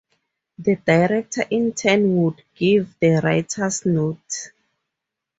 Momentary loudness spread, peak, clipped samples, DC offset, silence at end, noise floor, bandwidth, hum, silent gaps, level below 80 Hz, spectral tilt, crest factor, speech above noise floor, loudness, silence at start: 9 LU; -2 dBFS; under 0.1%; under 0.1%; 0.9 s; -83 dBFS; 8 kHz; none; none; -58 dBFS; -5.5 dB/octave; 18 dB; 64 dB; -20 LUFS; 0.6 s